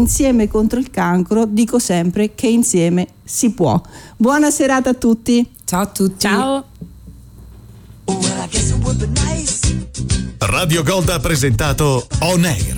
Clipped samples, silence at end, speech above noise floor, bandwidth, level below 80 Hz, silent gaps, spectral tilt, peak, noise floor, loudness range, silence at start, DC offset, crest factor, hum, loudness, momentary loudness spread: under 0.1%; 0 s; 24 dB; 19 kHz; -28 dBFS; none; -5 dB/octave; -4 dBFS; -38 dBFS; 4 LU; 0 s; under 0.1%; 12 dB; none; -16 LUFS; 6 LU